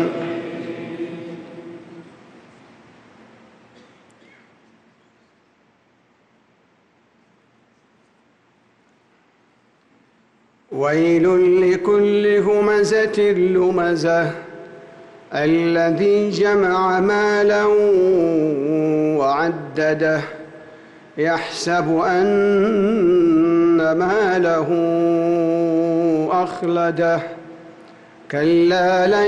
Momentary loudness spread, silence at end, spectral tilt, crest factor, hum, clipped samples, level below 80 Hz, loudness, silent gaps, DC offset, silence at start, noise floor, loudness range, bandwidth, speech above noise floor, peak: 15 LU; 0 s; -6.5 dB/octave; 10 dB; none; under 0.1%; -58 dBFS; -17 LUFS; none; under 0.1%; 0 s; -59 dBFS; 5 LU; 9.4 kHz; 43 dB; -8 dBFS